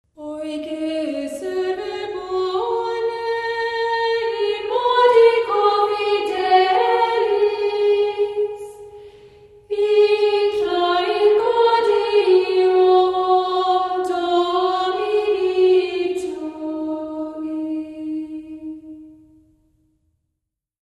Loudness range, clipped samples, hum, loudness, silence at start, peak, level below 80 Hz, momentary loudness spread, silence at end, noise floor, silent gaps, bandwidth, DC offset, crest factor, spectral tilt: 11 LU; under 0.1%; none; -19 LUFS; 0.2 s; -2 dBFS; -60 dBFS; 13 LU; 1.7 s; -80 dBFS; none; 11.5 kHz; under 0.1%; 16 dB; -4 dB/octave